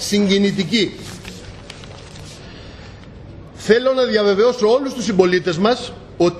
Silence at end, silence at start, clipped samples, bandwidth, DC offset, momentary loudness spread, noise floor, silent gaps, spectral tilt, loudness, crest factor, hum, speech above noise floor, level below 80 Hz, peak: 0 s; 0 s; under 0.1%; 13 kHz; under 0.1%; 22 LU; -37 dBFS; none; -5 dB/octave; -16 LUFS; 18 dB; none; 21 dB; -46 dBFS; 0 dBFS